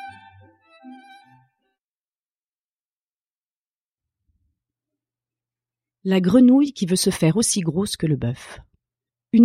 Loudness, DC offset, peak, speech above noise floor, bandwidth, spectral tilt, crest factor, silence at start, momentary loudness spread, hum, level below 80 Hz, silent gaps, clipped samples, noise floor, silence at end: -19 LUFS; under 0.1%; -4 dBFS; over 72 dB; 15 kHz; -5.5 dB/octave; 20 dB; 0 s; 18 LU; none; -56 dBFS; 1.84-2.29 s, 2.35-3.96 s; under 0.1%; under -90 dBFS; 0 s